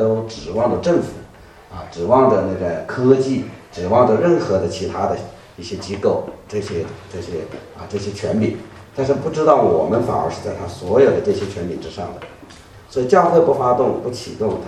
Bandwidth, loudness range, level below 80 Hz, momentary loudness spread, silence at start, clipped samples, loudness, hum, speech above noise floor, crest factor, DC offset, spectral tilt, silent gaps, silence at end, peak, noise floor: 11.5 kHz; 7 LU; -48 dBFS; 17 LU; 0 s; under 0.1%; -18 LUFS; none; 24 dB; 18 dB; under 0.1%; -7 dB/octave; none; 0 s; 0 dBFS; -42 dBFS